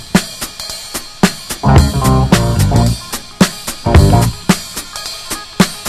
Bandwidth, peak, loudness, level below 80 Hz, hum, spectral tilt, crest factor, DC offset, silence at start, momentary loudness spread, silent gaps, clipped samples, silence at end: 14.5 kHz; 0 dBFS; -14 LUFS; -22 dBFS; none; -5 dB/octave; 12 dB; under 0.1%; 0 s; 13 LU; none; 0.5%; 0 s